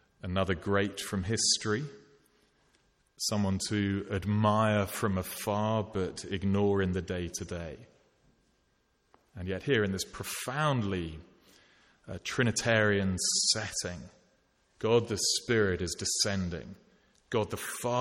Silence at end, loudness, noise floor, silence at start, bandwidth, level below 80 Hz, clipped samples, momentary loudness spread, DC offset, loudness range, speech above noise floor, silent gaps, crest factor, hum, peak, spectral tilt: 0 s; -30 LUFS; -72 dBFS; 0.25 s; 16.5 kHz; -58 dBFS; under 0.1%; 12 LU; under 0.1%; 5 LU; 42 dB; none; 20 dB; none; -12 dBFS; -4 dB/octave